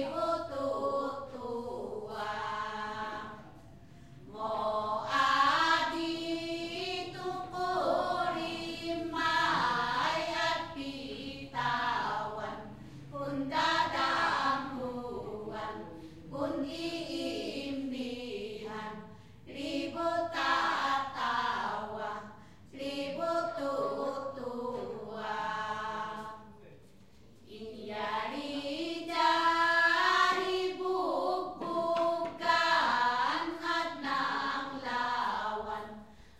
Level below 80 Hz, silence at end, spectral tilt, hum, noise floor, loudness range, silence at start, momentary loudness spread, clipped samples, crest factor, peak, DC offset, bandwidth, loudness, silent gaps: -64 dBFS; 0.1 s; -4 dB/octave; none; -59 dBFS; 9 LU; 0 s; 14 LU; under 0.1%; 20 dB; -14 dBFS; 0.1%; 15 kHz; -33 LUFS; none